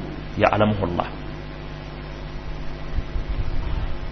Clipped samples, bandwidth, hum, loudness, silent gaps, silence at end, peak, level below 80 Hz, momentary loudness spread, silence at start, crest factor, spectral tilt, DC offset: under 0.1%; 6.2 kHz; 50 Hz at -35 dBFS; -27 LUFS; none; 0 s; -2 dBFS; -30 dBFS; 15 LU; 0 s; 22 dB; -8 dB/octave; 0.7%